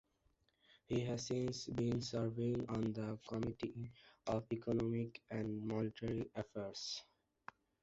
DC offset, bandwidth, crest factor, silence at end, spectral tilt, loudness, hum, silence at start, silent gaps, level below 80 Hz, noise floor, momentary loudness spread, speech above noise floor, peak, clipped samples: under 0.1%; 8 kHz; 16 dB; 0.8 s; -6.5 dB/octave; -42 LUFS; none; 0.9 s; none; -66 dBFS; -79 dBFS; 9 LU; 37 dB; -26 dBFS; under 0.1%